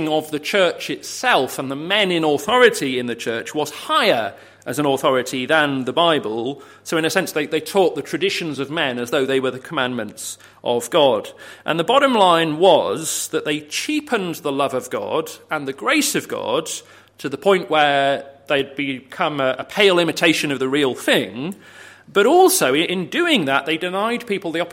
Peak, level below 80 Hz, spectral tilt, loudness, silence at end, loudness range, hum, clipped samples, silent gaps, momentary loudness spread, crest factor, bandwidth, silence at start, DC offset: 0 dBFS; -66 dBFS; -3.5 dB/octave; -19 LUFS; 0 s; 4 LU; none; under 0.1%; none; 12 LU; 18 dB; 16.5 kHz; 0 s; under 0.1%